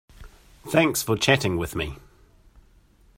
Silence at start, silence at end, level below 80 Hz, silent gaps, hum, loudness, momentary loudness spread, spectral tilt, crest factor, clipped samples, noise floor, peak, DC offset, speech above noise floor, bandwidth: 0.2 s; 1.2 s; -48 dBFS; none; none; -23 LUFS; 18 LU; -4 dB/octave; 22 dB; under 0.1%; -56 dBFS; -4 dBFS; under 0.1%; 33 dB; 16 kHz